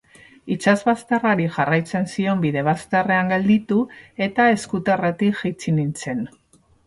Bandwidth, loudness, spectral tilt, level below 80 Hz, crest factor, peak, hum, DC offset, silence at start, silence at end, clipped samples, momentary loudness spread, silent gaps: 11.5 kHz; -20 LUFS; -6.5 dB/octave; -58 dBFS; 18 dB; -4 dBFS; none; under 0.1%; 0.45 s; 0.6 s; under 0.1%; 8 LU; none